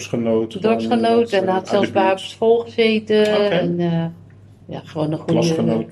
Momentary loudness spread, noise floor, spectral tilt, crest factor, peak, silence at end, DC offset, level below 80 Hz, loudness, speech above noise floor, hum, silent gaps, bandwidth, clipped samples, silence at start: 8 LU; -43 dBFS; -6.5 dB/octave; 14 dB; -4 dBFS; 0 s; under 0.1%; -60 dBFS; -18 LUFS; 25 dB; none; none; 12 kHz; under 0.1%; 0 s